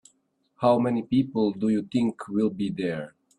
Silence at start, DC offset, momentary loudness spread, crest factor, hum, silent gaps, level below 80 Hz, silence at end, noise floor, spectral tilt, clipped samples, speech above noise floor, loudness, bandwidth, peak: 0.6 s; under 0.1%; 7 LU; 18 dB; none; none; -64 dBFS; 0.3 s; -69 dBFS; -8 dB/octave; under 0.1%; 45 dB; -26 LUFS; 10.5 kHz; -8 dBFS